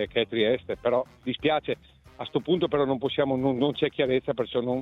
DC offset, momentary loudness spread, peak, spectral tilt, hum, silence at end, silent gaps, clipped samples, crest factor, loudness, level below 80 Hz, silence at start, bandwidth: under 0.1%; 7 LU; -10 dBFS; -8 dB/octave; none; 0 s; none; under 0.1%; 16 dB; -27 LUFS; -56 dBFS; 0 s; 6.2 kHz